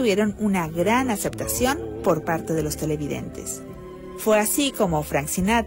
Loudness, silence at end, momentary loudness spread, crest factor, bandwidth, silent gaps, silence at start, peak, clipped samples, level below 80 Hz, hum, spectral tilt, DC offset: -23 LUFS; 0 s; 11 LU; 14 dB; 16.5 kHz; none; 0 s; -10 dBFS; under 0.1%; -42 dBFS; none; -4.5 dB/octave; under 0.1%